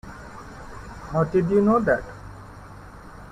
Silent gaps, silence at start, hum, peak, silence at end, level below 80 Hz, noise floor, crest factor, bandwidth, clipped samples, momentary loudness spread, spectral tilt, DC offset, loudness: none; 0.05 s; none; -8 dBFS; 0 s; -46 dBFS; -42 dBFS; 18 dB; 10.5 kHz; under 0.1%; 24 LU; -8.5 dB/octave; under 0.1%; -22 LUFS